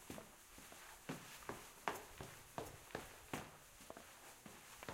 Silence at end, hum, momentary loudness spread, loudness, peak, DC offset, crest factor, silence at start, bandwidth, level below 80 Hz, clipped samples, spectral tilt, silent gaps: 0 s; none; 10 LU; -53 LUFS; -22 dBFS; under 0.1%; 32 dB; 0 s; 16 kHz; -70 dBFS; under 0.1%; -3.5 dB/octave; none